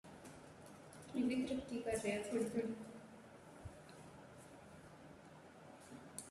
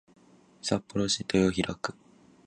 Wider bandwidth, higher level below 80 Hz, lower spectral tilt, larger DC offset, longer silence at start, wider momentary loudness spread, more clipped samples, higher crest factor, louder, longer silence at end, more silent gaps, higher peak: first, 13.5 kHz vs 10.5 kHz; second, -72 dBFS vs -54 dBFS; about the same, -5 dB/octave vs -4.5 dB/octave; neither; second, 0.05 s vs 0.65 s; first, 19 LU vs 12 LU; neither; about the same, 18 dB vs 20 dB; second, -42 LUFS vs -29 LUFS; second, 0 s vs 0.55 s; neither; second, -28 dBFS vs -10 dBFS